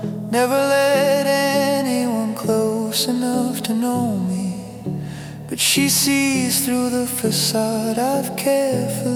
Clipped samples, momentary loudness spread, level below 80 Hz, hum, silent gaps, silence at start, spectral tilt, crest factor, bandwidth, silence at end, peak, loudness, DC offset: under 0.1%; 10 LU; -56 dBFS; none; none; 0 s; -3.5 dB/octave; 14 dB; over 20 kHz; 0 s; -4 dBFS; -19 LUFS; under 0.1%